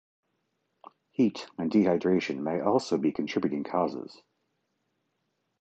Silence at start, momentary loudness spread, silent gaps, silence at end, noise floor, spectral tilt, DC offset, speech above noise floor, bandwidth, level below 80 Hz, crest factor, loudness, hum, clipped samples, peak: 1.2 s; 9 LU; none; 1.45 s; -78 dBFS; -6.5 dB/octave; under 0.1%; 51 dB; 8.8 kHz; -68 dBFS; 18 dB; -28 LUFS; none; under 0.1%; -12 dBFS